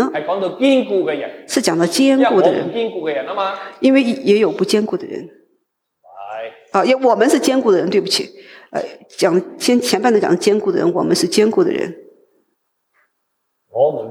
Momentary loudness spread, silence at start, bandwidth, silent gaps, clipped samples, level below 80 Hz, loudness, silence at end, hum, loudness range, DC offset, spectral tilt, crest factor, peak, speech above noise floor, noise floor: 13 LU; 0 s; 16.5 kHz; none; under 0.1%; -68 dBFS; -16 LUFS; 0 s; none; 3 LU; under 0.1%; -4.5 dB/octave; 16 dB; -2 dBFS; 56 dB; -71 dBFS